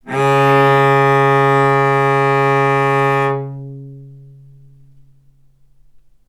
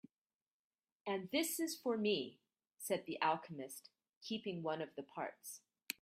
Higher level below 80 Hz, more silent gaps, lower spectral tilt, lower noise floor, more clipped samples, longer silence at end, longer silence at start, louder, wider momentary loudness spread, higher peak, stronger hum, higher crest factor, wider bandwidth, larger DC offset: first, -56 dBFS vs -88 dBFS; second, none vs 4.17-4.21 s; first, -7 dB/octave vs -3.5 dB/octave; second, -49 dBFS vs under -90 dBFS; neither; first, 2.15 s vs 0.1 s; second, 0.05 s vs 1.05 s; first, -13 LUFS vs -41 LUFS; about the same, 14 LU vs 14 LU; first, 0 dBFS vs -20 dBFS; neither; second, 16 dB vs 24 dB; second, 14 kHz vs 16 kHz; neither